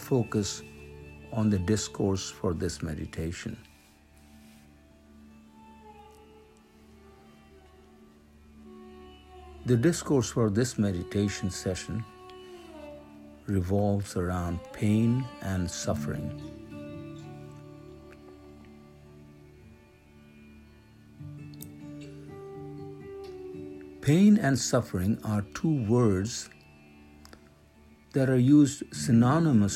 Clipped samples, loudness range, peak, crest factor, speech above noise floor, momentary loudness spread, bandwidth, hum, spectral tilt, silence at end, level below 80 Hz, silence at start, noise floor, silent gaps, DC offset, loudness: under 0.1%; 21 LU; -10 dBFS; 20 dB; 31 dB; 25 LU; 15 kHz; none; -6 dB/octave; 0 s; -56 dBFS; 0 s; -57 dBFS; none; under 0.1%; -27 LUFS